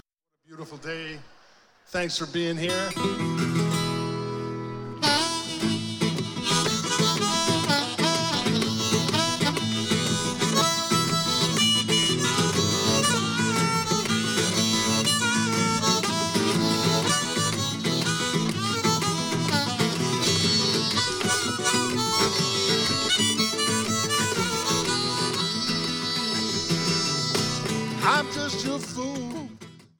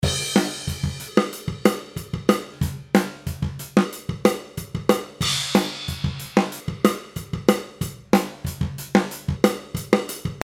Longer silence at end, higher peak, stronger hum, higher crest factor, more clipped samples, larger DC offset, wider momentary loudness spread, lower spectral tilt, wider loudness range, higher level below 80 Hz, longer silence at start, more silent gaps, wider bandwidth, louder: first, 0.2 s vs 0 s; second, -8 dBFS vs 0 dBFS; neither; about the same, 18 dB vs 22 dB; neither; neither; about the same, 7 LU vs 9 LU; second, -3 dB/octave vs -5 dB/octave; first, 4 LU vs 1 LU; second, -60 dBFS vs -42 dBFS; first, 0.5 s vs 0 s; neither; about the same, 19 kHz vs 17.5 kHz; about the same, -23 LUFS vs -24 LUFS